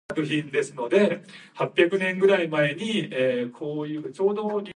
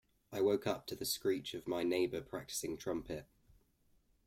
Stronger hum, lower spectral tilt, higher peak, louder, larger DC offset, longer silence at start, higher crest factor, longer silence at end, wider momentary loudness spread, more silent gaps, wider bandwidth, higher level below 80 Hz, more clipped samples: neither; first, -5.5 dB/octave vs -4 dB/octave; first, -4 dBFS vs -22 dBFS; first, -24 LUFS vs -38 LUFS; neither; second, 0.1 s vs 0.3 s; about the same, 20 dB vs 18 dB; second, 0.05 s vs 1 s; about the same, 10 LU vs 9 LU; neither; second, 10.5 kHz vs 16.5 kHz; second, -72 dBFS vs -66 dBFS; neither